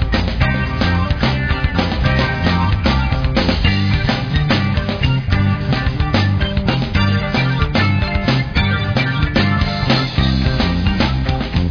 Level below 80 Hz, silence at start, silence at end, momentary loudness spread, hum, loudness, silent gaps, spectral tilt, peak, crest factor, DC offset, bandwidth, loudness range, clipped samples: -22 dBFS; 0 s; 0 s; 2 LU; none; -16 LUFS; none; -7 dB/octave; 0 dBFS; 14 dB; under 0.1%; 5.4 kHz; 1 LU; under 0.1%